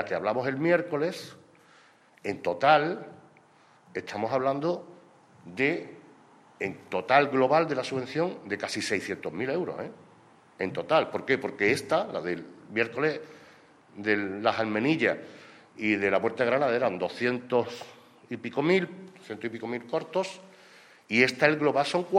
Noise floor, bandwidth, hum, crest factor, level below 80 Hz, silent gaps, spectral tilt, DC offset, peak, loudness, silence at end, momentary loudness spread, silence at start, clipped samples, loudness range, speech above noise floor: -59 dBFS; 13.5 kHz; none; 24 dB; -74 dBFS; none; -5.5 dB/octave; under 0.1%; -4 dBFS; -28 LUFS; 0 s; 15 LU; 0 s; under 0.1%; 5 LU; 32 dB